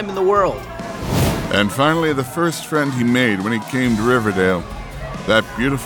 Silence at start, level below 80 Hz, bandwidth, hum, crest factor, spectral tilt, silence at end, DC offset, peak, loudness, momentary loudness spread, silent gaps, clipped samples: 0 s; -36 dBFS; over 20 kHz; none; 16 dB; -5.5 dB/octave; 0 s; under 0.1%; -2 dBFS; -18 LUFS; 11 LU; none; under 0.1%